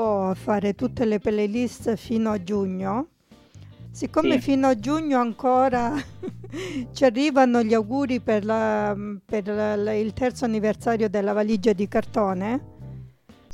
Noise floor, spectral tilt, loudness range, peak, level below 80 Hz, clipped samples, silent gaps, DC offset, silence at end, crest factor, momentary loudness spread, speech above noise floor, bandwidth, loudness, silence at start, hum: -49 dBFS; -6.5 dB/octave; 3 LU; -6 dBFS; -52 dBFS; under 0.1%; none; under 0.1%; 0 s; 18 dB; 11 LU; 26 dB; 13 kHz; -23 LUFS; 0 s; none